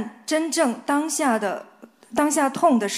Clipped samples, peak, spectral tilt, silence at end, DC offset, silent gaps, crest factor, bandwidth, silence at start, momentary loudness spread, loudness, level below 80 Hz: under 0.1%; -6 dBFS; -3 dB/octave; 0 s; under 0.1%; none; 16 dB; 15.5 kHz; 0 s; 8 LU; -22 LUFS; -68 dBFS